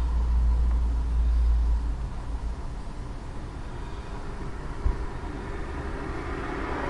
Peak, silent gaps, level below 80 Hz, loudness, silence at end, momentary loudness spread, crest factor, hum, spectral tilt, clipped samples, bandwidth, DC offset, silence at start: -12 dBFS; none; -28 dBFS; -31 LUFS; 0 s; 13 LU; 16 dB; none; -7.5 dB/octave; under 0.1%; 7.2 kHz; under 0.1%; 0 s